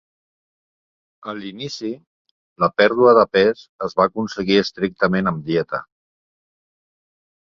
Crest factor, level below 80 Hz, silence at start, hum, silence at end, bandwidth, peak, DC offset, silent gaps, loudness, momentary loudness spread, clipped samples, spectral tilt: 20 dB; -56 dBFS; 1.25 s; none; 1.75 s; 7.4 kHz; -2 dBFS; under 0.1%; 2.07-2.25 s, 2.31-2.56 s, 3.69-3.79 s; -18 LUFS; 17 LU; under 0.1%; -6 dB/octave